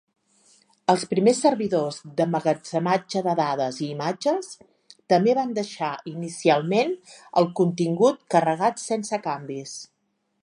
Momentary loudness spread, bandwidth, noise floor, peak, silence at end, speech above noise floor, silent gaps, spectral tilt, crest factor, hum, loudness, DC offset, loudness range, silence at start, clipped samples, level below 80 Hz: 10 LU; 11 kHz; -73 dBFS; -4 dBFS; 0.6 s; 50 dB; none; -5.5 dB/octave; 20 dB; none; -24 LUFS; under 0.1%; 2 LU; 0.9 s; under 0.1%; -74 dBFS